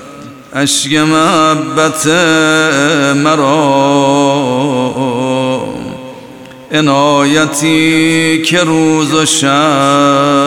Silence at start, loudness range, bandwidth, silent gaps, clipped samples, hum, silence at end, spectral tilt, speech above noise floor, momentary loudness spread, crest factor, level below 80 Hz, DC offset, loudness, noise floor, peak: 0 s; 4 LU; 17 kHz; none; under 0.1%; none; 0 s; -4 dB/octave; 22 dB; 7 LU; 10 dB; -50 dBFS; under 0.1%; -10 LUFS; -31 dBFS; 0 dBFS